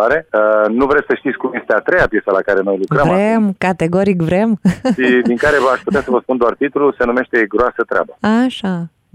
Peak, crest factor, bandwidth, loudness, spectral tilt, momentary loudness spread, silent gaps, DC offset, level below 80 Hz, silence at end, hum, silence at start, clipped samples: -2 dBFS; 12 dB; 12 kHz; -14 LUFS; -7 dB/octave; 5 LU; none; under 0.1%; -40 dBFS; 0.25 s; none; 0 s; under 0.1%